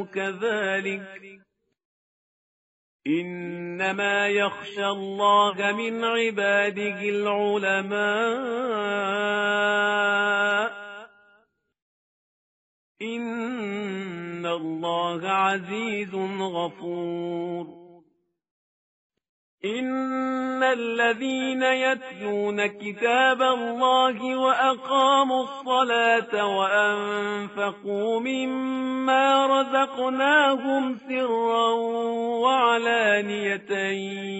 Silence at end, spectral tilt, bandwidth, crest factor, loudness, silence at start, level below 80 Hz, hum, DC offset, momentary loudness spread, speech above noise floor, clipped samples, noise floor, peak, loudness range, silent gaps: 0 s; -1.5 dB/octave; 8 kHz; 18 dB; -24 LUFS; 0 s; -74 dBFS; none; under 0.1%; 10 LU; 43 dB; under 0.1%; -67 dBFS; -6 dBFS; 11 LU; 1.85-2.99 s, 11.82-12.95 s, 18.51-19.10 s, 19.29-19.58 s